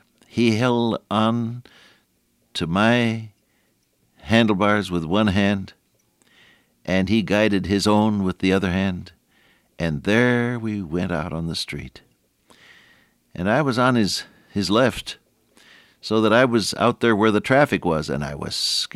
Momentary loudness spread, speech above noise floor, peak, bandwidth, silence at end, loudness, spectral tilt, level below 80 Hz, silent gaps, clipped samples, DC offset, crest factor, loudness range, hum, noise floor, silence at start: 13 LU; 45 dB; -4 dBFS; 14.5 kHz; 0.1 s; -21 LUFS; -5.5 dB/octave; -50 dBFS; none; under 0.1%; under 0.1%; 18 dB; 4 LU; none; -66 dBFS; 0.35 s